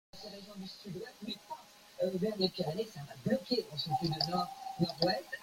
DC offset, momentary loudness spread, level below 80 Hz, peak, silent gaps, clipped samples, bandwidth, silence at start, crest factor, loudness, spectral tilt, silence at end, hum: under 0.1%; 14 LU; -68 dBFS; -14 dBFS; none; under 0.1%; 16.5 kHz; 0.15 s; 22 dB; -36 LUFS; -5.5 dB/octave; 0 s; none